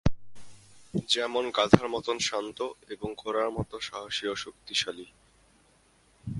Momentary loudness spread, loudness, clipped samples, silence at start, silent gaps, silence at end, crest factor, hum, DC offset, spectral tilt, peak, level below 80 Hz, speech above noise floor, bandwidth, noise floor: 14 LU; -29 LUFS; under 0.1%; 0.05 s; none; 0 s; 30 dB; none; under 0.1%; -4.5 dB/octave; 0 dBFS; -48 dBFS; 34 dB; 11.5 kHz; -63 dBFS